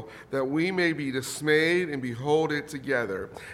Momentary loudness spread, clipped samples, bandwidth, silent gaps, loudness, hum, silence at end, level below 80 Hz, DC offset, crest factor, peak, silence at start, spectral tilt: 9 LU; under 0.1%; 15.5 kHz; none; -27 LUFS; none; 0 s; -62 dBFS; under 0.1%; 18 dB; -8 dBFS; 0 s; -5 dB/octave